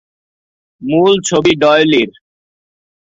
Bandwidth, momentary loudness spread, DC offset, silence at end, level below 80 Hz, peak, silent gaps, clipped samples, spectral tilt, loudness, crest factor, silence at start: 8 kHz; 9 LU; under 0.1%; 1 s; -52 dBFS; 0 dBFS; none; under 0.1%; -4.5 dB/octave; -12 LUFS; 14 dB; 0.8 s